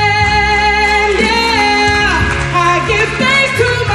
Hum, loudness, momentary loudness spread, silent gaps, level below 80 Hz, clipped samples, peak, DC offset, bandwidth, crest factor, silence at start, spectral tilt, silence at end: none; -11 LUFS; 3 LU; none; -26 dBFS; under 0.1%; 0 dBFS; under 0.1%; 13 kHz; 12 dB; 0 s; -4 dB/octave; 0 s